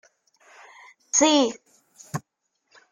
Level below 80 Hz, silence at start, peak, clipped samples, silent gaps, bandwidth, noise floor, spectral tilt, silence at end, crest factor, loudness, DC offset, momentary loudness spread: -72 dBFS; 1.15 s; -6 dBFS; under 0.1%; none; 15 kHz; -76 dBFS; -2.5 dB/octave; 0.7 s; 20 dB; -20 LUFS; under 0.1%; 18 LU